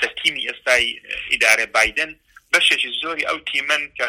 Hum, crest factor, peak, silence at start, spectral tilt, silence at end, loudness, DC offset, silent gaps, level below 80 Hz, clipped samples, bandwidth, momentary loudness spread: none; 20 dB; 0 dBFS; 0 s; 0.5 dB/octave; 0 s; -18 LUFS; under 0.1%; none; -52 dBFS; under 0.1%; 16.5 kHz; 9 LU